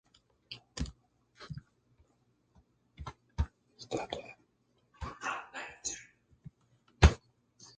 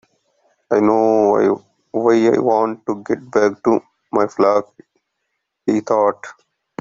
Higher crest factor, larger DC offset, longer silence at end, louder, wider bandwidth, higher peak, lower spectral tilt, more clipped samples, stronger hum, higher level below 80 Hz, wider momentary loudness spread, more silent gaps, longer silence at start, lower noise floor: first, 30 dB vs 16 dB; neither; second, 0.1 s vs 0.5 s; second, -35 LUFS vs -17 LUFS; first, 9.2 kHz vs 7.6 kHz; second, -6 dBFS vs -2 dBFS; second, -5 dB/octave vs -6.5 dB/octave; neither; neither; first, -40 dBFS vs -62 dBFS; first, 28 LU vs 12 LU; neither; second, 0.5 s vs 0.7 s; about the same, -74 dBFS vs -74 dBFS